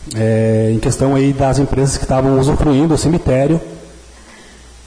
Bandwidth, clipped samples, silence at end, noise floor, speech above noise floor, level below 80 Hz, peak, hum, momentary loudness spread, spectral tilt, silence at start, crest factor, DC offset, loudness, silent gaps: 10.5 kHz; under 0.1%; 0.9 s; -39 dBFS; 26 dB; -28 dBFS; -4 dBFS; none; 3 LU; -6.5 dB/octave; 0 s; 10 dB; under 0.1%; -14 LUFS; none